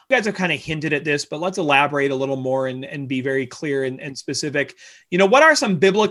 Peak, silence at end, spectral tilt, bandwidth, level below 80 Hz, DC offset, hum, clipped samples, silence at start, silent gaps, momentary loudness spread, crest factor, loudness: -2 dBFS; 0 s; -4.5 dB/octave; 12.5 kHz; -60 dBFS; under 0.1%; none; under 0.1%; 0.1 s; none; 12 LU; 18 dB; -19 LUFS